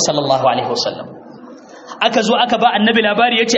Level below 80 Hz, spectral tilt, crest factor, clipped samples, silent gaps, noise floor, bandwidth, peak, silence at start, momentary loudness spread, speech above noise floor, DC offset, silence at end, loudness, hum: -60 dBFS; -3 dB/octave; 16 dB; under 0.1%; none; -37 dBFS; 8.2 kHz; 0 dBFS; 0 s; 13 LU; 22 dB; under 0.1%; 0 s; -14 LUFS; none